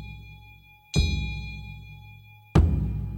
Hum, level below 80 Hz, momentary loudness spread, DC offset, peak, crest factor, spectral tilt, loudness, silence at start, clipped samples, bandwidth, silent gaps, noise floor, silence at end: none; -32 dBFS; 24 LU; under 0.1%; -6 dBFS; 22 dB; -6 dB/octave; -26 LUFS; 0 s; under 0.1%; 15.5 kHz; none; -51 dBFS; 0 s